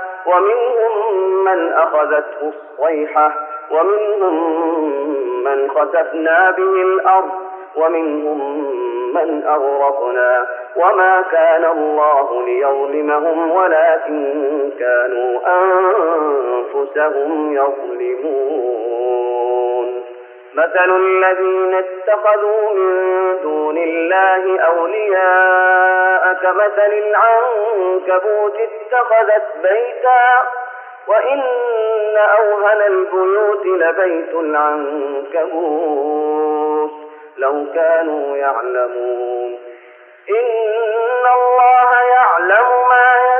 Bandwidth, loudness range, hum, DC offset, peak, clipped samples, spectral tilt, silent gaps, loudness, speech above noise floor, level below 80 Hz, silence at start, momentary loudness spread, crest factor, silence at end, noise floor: 3.4 kHz; 5 LU; none; under 0.1%; -2 dBFS; under 0.1%; 1 dB/octave; none; -15 LUFS; 28 dB; -88 dBFS; 0 s; 9 LU; 14 dB; 0 s; -42 dBFS